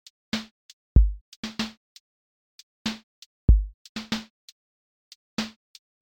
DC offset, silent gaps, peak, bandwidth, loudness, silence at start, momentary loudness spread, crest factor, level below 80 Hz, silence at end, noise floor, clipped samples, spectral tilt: under 0.1%; 0.51-0.95 s, 1.21-1.43 s, 1.77-2.85 s, 3.03-3.48 s, 3.74-3.95 s, 4.30-5.37 s; -6 dBFS; 9 kHz; -28 LUFS; 0.35 s; 15 LU; 22 dB; -28 dBFS; 0.55 s; under -90 dBFS; under 0.1%; -5.5 dB/octave